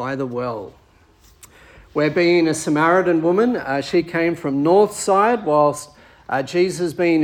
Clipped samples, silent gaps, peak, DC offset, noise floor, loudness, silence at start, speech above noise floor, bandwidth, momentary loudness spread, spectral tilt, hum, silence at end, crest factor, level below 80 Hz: under 0.1%; none; -4 dBFS; under 0.1%; -52 dBFS; -18 LUFS; 0 s; 34 dB; 15.5 kHz; 10 LU; -5.5 dB/octave; none; 0 s; 16 dB; -56 dBFS